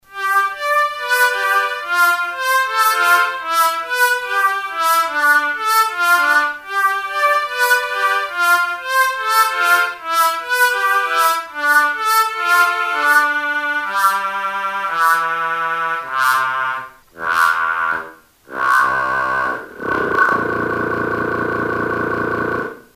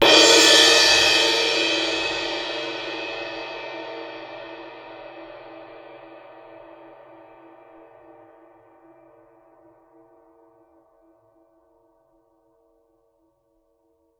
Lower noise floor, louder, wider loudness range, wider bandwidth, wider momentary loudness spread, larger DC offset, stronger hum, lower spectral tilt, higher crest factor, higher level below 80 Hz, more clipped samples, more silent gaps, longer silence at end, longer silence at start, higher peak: second, -39 dBFS vs -67 dBFS; about the same, -16 LUFS vs -16 LUFS; second, 3 LU vs 28 LU; second, 16 kHz vs 18.5 kHz; second, 6 LU vs 29 LU; neither; neither; first, -2 dB/octave vs 0 dB/octave; second, 16 dB vs 24 dB; about the same, -56 dBFS vs -60 dBFS; neither; neither; second, 0.15 s vs 8.25 s; about the same, 0.1 s vs 0 s; about the same, -2 dBFS vs 0 dBFS